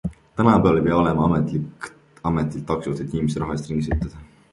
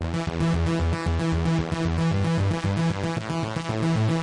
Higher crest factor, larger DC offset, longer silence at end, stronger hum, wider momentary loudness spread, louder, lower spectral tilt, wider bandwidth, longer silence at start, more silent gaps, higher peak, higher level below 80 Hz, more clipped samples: first, 20 dB vs 10 dB; neither; first, 0.25 s vs 0 s; neither; first, 14 LU vs 5 LU; first, -22 LUFS vs -25 LUFS; about the same, -8 dB/octave vs -7 dB/octave; about the same, 11.5 kHz vs 11 kHz; about the same, 0.05 s vs 0 s; neither; first, -2 dBFS vs -14 dBFS; about the same, -38 dBFS vs -38 dBFS; neither